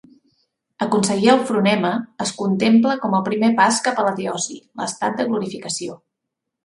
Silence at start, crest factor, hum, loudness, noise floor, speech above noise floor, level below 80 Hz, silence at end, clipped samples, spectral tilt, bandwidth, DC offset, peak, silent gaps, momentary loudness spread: 0.8 s; 20 dB; none; -19 LUFS; -81 dBFS; 62 dB; -64 dBFS; 0.7 s; under 0.1%; -4.5 dB/octave; 11.5 kHz; under 0.1%; 0 dBFS; none; 11 LU